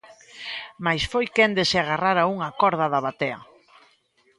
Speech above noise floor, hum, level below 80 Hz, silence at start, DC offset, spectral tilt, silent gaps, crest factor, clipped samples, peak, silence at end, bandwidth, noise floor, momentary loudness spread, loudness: 40 dB; none; -52 dBFS; 0.1 s; under 0.1%; -4.5 dB/octave; none; 20 dB; under 0.1%; -6 dBFS; 0.95 s; 11.5 kHz; -63 dBFS; 14 LU; -23 LUFS